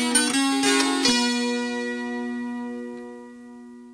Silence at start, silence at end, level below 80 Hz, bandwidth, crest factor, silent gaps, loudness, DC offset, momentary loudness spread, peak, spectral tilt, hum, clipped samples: 0 s; 0 s; -62 dBFS; 11 kHz; 20 dB; none; -22 LUFS; under 0.1%; 23 LU; -6 dBFS; -1 dB/octave; none; under 0.1%